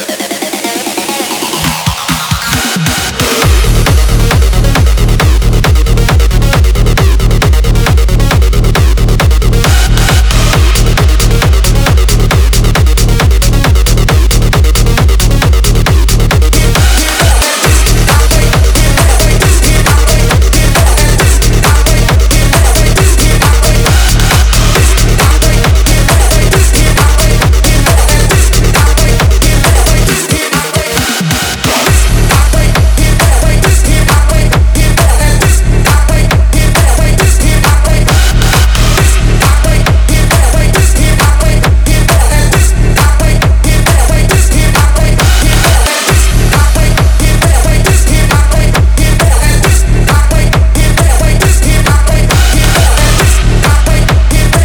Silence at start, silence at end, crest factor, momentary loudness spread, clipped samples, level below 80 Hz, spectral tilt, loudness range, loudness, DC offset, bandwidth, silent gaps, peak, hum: 0 s; 0 s; 6 dB; 2 LU; 1%; -8 dBFS; -4 dB/octave; 1 LU; -8 LUFS; under 0.1%; over 20 kHz; none; 0 dBFS; none